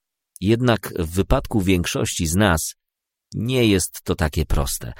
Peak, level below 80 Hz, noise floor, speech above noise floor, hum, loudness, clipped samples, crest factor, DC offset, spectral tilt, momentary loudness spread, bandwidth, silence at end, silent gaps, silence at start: -2 dBFS; -32 dBFS; -83 dBFS; 63 dB; none; -21 LUFS; under 0.1%; 20 dB; under 0.1%; -5 dB/octave; 7 LU; 16.5 kHz; 0.05 s; none; 0.4 s